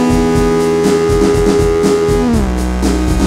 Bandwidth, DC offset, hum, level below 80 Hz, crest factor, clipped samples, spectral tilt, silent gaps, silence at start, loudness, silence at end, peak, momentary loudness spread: 15.5 kHz; under 0.1%; none; -20 dBFS; 10 dB; under 0.1%; -6 dB/octave; none; 0 s; -12 LUFS; 0 s; 0 dBFS; 3 LU